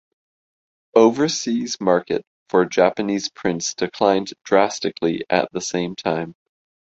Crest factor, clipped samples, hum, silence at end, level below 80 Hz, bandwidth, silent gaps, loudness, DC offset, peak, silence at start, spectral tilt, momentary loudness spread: 18 dB; under 0.1%; none; 0.5 s; -60 dBFS; 8 kHz; 2.27-2.46 s; -20 LUFS; under 0.1%; -2 dBFS; 0.95 s; -4 dB/octave; 8 LU